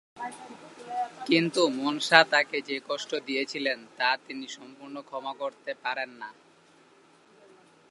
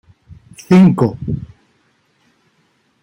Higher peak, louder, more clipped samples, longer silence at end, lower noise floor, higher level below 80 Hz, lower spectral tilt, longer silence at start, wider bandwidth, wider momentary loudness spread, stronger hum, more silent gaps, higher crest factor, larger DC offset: about the same, 0 dBFS vs -2 dBFS; second, -27 LUFS vs -13 LUFS; neither; about the same, 1.6 s vs 1.6 s; about the same, -59 dBFS vs -60 dBFS; second, -84 dBFS vs -46 dBFS; second, -3.5 dB/octave vs -8.5 dB/octave; second, 0.15 s vs 0.7 s; first, 11.5 kHz vs 9.8 kHz; first, 22 LU vs 15 LU; neither; neither; first, 28 dB vs 16 dB; neither